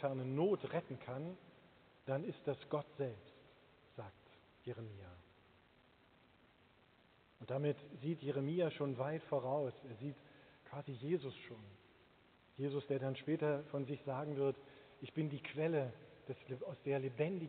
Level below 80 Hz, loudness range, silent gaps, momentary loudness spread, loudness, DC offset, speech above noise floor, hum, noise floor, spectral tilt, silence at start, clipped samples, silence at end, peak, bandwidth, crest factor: -80 dBFS; 13 LU; none; 19 LU; -42 LUFS; under 0.1%; 29 dB; none; -70 dBFS; -6.5 dB/octave; 0 s; under 0.1%; 0 s; -24 dBFS; 4.5 kHz; 20 dB